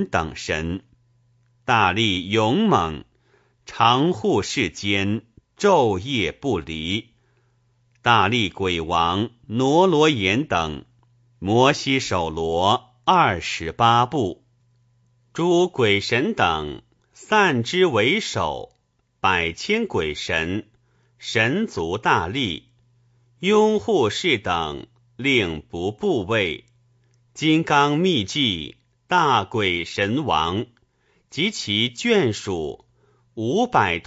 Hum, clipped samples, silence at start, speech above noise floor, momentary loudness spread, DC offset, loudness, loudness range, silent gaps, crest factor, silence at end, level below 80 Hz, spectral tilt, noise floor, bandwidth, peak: none; under 0.1%; 0 s; 47 dB; 11 LU; under 0.1%; -21 LUFS; 3 LU; none; 20 dB; 0.05 s; -50 dBFS; -5 dB/octave; -68 dBFS; 8 kHz; -2 dBFS